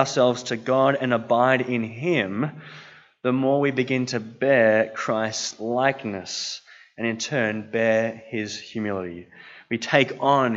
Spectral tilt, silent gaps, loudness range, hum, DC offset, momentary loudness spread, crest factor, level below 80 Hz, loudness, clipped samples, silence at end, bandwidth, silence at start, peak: -4.5 dB/octave; none; 4 LU; none; under 0.1%; 11 LU; 22 dB; -72 dBFS; -23 LUFS; under 0.1%; 0 s; 8 kHz; 0 s; -2 dBFS